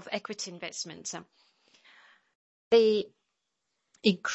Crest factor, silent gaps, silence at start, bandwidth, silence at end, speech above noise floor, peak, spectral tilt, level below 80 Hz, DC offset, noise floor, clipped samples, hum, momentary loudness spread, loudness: 20 dB; 2.35-2.71 s; 0 s; 8.2 kHz; 0 s; 54 dB; -10 dBFS; -4 dB/octave; -78 dBFS; under 0.1%; -82 dBFS; under 0.1%; none; 16 LU; -29 LUFS